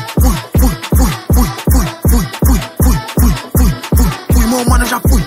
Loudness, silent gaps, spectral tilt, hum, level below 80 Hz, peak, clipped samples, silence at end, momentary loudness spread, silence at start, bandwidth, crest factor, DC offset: -13 LUFS; none; -5.5 dB/octave; none; -14 dBFS; 0 dBFS; under 0.1%; 0 s; 2 LU; 0 s; 16.5 kHz; 12 dB; 0.2%